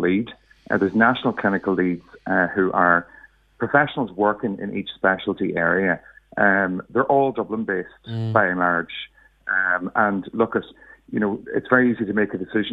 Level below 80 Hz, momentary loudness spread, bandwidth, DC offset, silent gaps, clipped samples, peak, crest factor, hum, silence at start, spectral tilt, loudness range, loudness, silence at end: -58 dBFS; 11 LU; 5 kHz; under 0.1%; none; under 0.1%; 0 dBFS; 22 dB; none; 0 s; -9 dB/octave; 2 LU; -21 LUFS; 0 s